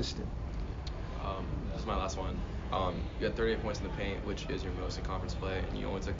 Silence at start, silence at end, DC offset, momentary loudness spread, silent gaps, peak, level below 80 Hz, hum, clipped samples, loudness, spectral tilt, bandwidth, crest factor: 0 s; 0 s; under 0.1%; 7 LU; none; -20 dBFS; -40 dBFS; none; under 0.1%; -37 LUFS; -5 dB/octave; 7.4 kHz; 16 dB